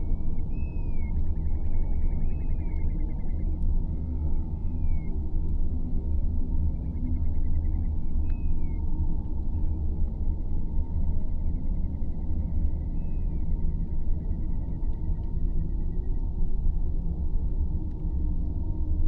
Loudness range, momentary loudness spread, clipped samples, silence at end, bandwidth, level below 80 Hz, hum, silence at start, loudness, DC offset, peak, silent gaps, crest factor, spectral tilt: 1 LU; 3 LU; under 0.1%; 0 s; 2.3 kHz; -26 dBFS; none; 0 s; -32 LUFS; under 0.1%; -12 dBFS; none; 12 dB; -12 dB/octave